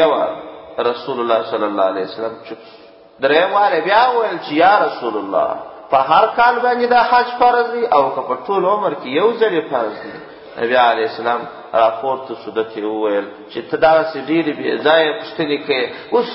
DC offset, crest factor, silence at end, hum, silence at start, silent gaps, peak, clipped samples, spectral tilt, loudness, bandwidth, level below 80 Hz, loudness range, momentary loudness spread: under 0.1%; 16 dB; 0 s; none; 0 s; none; 0 dBFS; under 0.1%; -9 dB/octave; -16 LUFS; 5.8 kHz; -58 dBFS; 4 LU; 11 LU